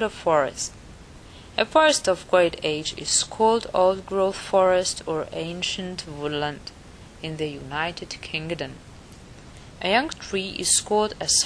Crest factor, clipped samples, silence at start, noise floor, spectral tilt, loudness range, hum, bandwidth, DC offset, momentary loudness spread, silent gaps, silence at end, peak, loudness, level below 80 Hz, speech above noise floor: 22 dB; under 0.1%; 0 s; -44 dBFS; -2.5 dB/octave; 9 LU; none; 11 kHz; under 0.1%; 13 LU; none; 0 s; -4 dBFS; -23 LUFS; -50 dBFS; 21 dB